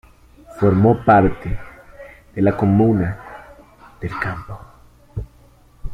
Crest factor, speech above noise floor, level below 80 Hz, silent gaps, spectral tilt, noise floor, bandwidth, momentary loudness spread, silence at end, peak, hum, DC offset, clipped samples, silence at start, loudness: 18 dB; 33 dB; -36 dBFS; none; -10 dB/octave; -49 dBFS; 9.4 kHz; 23 LU; 0 s; -2 dBFS; none; under 0.1%; under 0.1%; 0.5 s; -17 LUFS